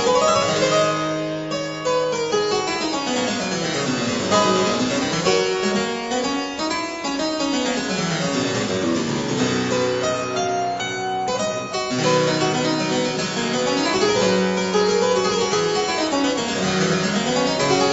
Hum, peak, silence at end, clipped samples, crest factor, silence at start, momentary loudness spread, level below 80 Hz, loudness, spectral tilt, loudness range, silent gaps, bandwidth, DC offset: none; -4 dBFS; 0 s; under 0.1%; 16 dB; 0 s; 6 LU; -54 dBFS; -20 LUFS; -4 dB/octave; 3 LU; none; 8.2 kHz; under 0.1%